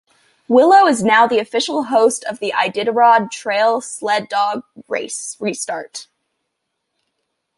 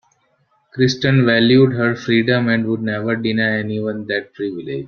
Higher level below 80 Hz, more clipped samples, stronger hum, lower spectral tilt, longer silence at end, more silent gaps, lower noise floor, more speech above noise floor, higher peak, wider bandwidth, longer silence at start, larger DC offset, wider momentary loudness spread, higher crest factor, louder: second, -66 dBFS vs -54 dBFS; neither; neither; second, -3 dB/octave vs -6.5 dB/octave; first, 1.55 s vs 0 s; neither; first, -75 dBFS vs -62 dBFS; first, 59 dB vs 45 dB; about the same, 0 dBFS vs -2 dBFS; first, 11.5 kHz vs 6.8 kHz; second, 0.5 s vs 0.75 s; neither; first, 14 LU vs 11 LU; about the same, 16 dB vs 16 dB; about the same, -16 LUFS vs -17 LUFS